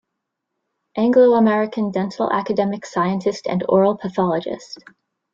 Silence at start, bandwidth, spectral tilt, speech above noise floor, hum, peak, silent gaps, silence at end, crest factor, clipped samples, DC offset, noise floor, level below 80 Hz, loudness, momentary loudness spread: 0.95 s; 7.6 kHz; -7 dB/octave; 60 dB; none; -4 dBFS; none; 0.6 s; 16 dB; under 0.1%; under 0.1%; -79 dBFS; -62 dBFS; -19 LUFS; 15 LU